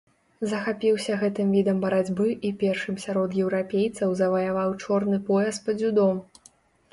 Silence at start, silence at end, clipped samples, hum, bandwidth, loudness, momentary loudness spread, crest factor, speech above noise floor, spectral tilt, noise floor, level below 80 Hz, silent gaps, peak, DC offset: 0.4 s; 0.7 s; under 0.1%; none; 11.5 kHz; -25 LUFS; 5 LU; 14 dB; 34 dB; -6.5 dB/octave; -58 dBFS; -64 dBFS; none; -12 dBFS; under 0.1%